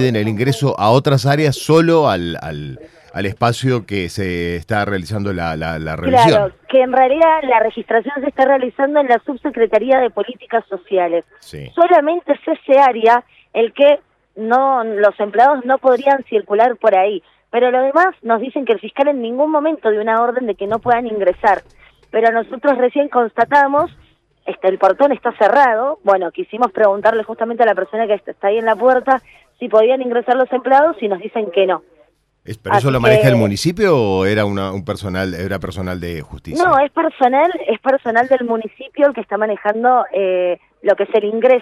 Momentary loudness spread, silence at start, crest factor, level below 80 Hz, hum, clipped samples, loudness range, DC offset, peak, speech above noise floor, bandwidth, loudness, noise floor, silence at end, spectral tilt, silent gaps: 10 LU; 0 s; 14 dB; -48 dBFS; none; under 0.1%; 3 LU; under 0.1%; -2 dBFS; 40 dB; 14 kHz; -15 LUFS; -55 dBFS; 0 s; -6.5 dB/octave; none